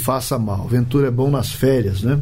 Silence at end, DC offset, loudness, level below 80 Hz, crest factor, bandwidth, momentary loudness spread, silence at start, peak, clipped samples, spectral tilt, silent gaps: 0 s; under 0.1%; -19 LUFS; -38 dBFS; 12 dB; 16.5 kHz; 3 LU; 0 s; -6 dBFS; under 0.1%; -6.5 dB/octave; none